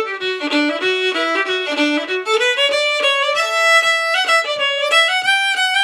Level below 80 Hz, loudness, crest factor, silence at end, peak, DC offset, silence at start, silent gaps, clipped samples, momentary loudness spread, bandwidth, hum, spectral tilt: -84 dBFS; -15 LUFS; 14 dB; 0 s; -2 dBFS; under 0.1%; 0 s; none; under 0.1%; 6 LU; 16 kHz; none; 0 dB/octave